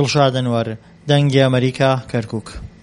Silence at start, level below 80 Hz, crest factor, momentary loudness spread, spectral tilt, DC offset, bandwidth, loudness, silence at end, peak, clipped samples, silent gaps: 0 s; -44 dBFS; 16 dB; 14 LU; -6 dB/octave; under 0.1%; 11 kHz; -17 LUFS; 0.15 s; 0 dBFS; under 0.1%; none